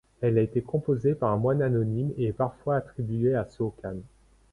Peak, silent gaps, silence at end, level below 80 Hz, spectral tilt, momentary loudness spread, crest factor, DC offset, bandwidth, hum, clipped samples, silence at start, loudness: -10 dBFS; none; 0.45 s; -54 dBFS; -10.5 dB/octave; 8 LU; 16 dB; under 0.1%; 10.5 kHz; none; under 0.1%; 0.2 s; -27 LUFS